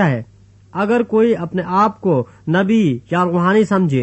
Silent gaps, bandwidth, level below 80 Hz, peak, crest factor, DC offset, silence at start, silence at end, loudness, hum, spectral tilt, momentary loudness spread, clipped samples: none; 8.4 kHz; -54 dBFS; -2 dBFS; 14 dB; under 0.1%; 0 s; 0 s; -16 LUFS; none; -8 dB/octave; 6 LU; under 0.1%